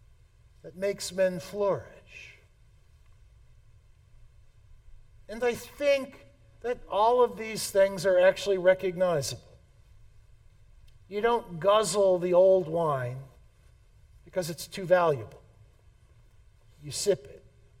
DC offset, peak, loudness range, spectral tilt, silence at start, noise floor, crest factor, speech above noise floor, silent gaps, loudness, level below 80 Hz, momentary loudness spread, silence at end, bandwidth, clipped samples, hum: under 0.1%; -10 dBFS; 8 LU; -4.5 dB/octave; 0.65 s; -58 dBFS; 20 dB; 32 dB; none; -27 LUFS; -58 dBFS; 19 LU; 0.45 s; 16.5 kHz; under 0.1%; none